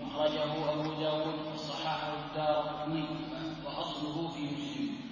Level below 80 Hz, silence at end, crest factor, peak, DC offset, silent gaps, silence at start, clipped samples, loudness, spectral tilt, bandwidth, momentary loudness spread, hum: -62 dBFS; 0 s; 18 dB; -18 dBFS; under 0.1%; none; 0 s; under 0.1%; -35 LUFS; -6 dB/octave; 7.4 kHz; 6 LU; none